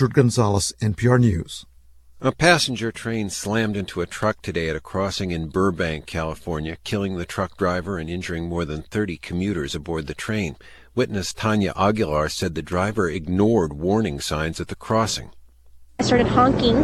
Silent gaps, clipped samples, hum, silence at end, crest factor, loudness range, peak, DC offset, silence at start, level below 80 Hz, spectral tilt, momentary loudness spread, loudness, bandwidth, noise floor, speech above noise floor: none; under 0.1%; none; 0 s; 22 dB; 5 LU; 0 dBFS; under 0.1%; 0 s; -42 dBFS; -5.5 dB/octave; 10 LU; -23 LUFS; 14 kHz; -48 dBFS; 26 dB